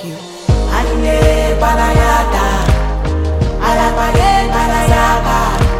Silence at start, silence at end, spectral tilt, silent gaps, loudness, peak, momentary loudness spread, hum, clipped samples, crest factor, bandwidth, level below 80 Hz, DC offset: 0 s; 0 s; -5.5 dB/octave; none; -13 LUFS; 0 dBFS; 5 LU; none; under 0.1%; 12 dB; 16 kHz; -16 dBFS; under 0.1%